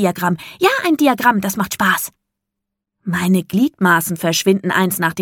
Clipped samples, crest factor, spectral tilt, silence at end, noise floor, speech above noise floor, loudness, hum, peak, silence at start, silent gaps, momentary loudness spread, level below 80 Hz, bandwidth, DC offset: under 0.1%; 16 dB; -4.5 dB/octave; 0 s; -80 dBFS; 64 dB; -16 LUFS; none; 0 dBFS; 0 s; none; 7 LU; -56 dBFS; 17.5 kHz; under 0.1%